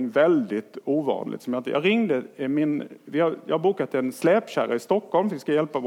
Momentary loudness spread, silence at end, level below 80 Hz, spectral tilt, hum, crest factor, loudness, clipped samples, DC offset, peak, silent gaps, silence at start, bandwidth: 8 LU; 0 s; -80 dBFS; -6.5 dB/octave; none; 16 dB; -24 LUFS; under 0.1%; under 0.1%; -8 dBFS; none; 0 s; 16.5 kHz